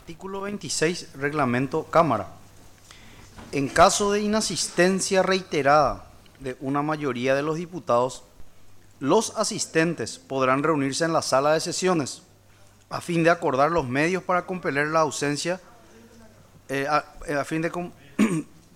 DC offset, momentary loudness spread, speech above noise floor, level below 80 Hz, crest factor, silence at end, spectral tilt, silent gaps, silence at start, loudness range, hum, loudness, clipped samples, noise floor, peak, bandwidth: under 0.1%; 12 LU; 29 dB; -52 dBFS; 18 dB; 0.3 s; -4 dB/octave; none; 0.05 s; 5 LU; none; -24 LUFS; under 0.1%; -53 dBFS; -6 dBFS; 16.5 kHz